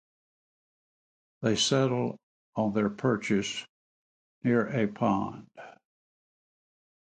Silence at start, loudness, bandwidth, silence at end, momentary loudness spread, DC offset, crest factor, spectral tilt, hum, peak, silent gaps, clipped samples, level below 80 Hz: 1.4 s; -29 LUFS; 9.4 kHz; 1.3 s; 15 LU; under 0.1%; 18 dB; -5 dB/octave; none; -12 dBFS; 2.23-2.53 s, 3.69-4.41 s; under 0.1%; -66 dBFS